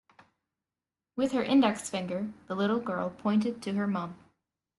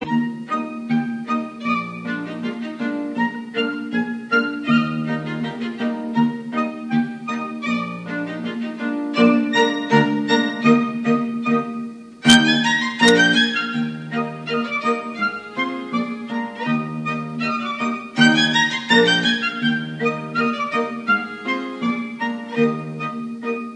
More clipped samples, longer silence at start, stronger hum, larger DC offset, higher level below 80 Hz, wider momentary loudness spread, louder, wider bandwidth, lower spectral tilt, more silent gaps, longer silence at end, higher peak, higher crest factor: neither; first, 1.15 s vs 0 s; neither; neither; second, -70 dBFS vs -60 dBFS; about the same, 11 LU vs 12 LU; second, -30 LUFS vs -20 LUFS; first, 12 kHz vs 10.5 kHz; about the same, -5.5 dB/octave vs -4.5 dB/octave; neither; first, 0.65 s vs 0 s; second, -12 dBFS vs 0 dBFS; about the same, 18 dB vs 20 dB